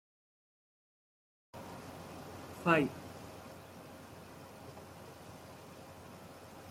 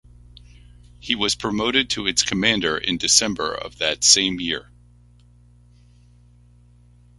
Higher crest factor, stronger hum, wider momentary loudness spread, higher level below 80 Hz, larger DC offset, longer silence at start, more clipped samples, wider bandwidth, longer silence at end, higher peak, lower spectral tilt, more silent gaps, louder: first, 30 dB vs 24 dB; second, none vs 60 Hz at -45 dBFS; first, 21 LU vs 12 LU; second, -72 dBFS vs -48 dBFS; neither; first, 1.55 s vs 0.35 s; neither; first, 16.5 kHz vs 11.5 kHz; second, 0 s vs 2.55 s; second, -12 dBFS vs 0 dBFS; first, -5.5 dB/octave vs -1.5 dB/octave; neither; second, -37 LUFS vs -19 LUFS